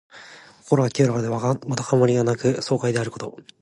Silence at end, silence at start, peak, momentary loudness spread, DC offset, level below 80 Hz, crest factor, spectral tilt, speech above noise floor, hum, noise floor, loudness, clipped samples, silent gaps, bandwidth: 0.2 s; 0.15 s; -4 dBFS; 12 LU; under 0.1%; -60 dBFS; 18 dB; -6.5 dB/octave; 24 dB; none; -46 dBFS; -22 LUFS; under 0.1%; none; 11.5 kHz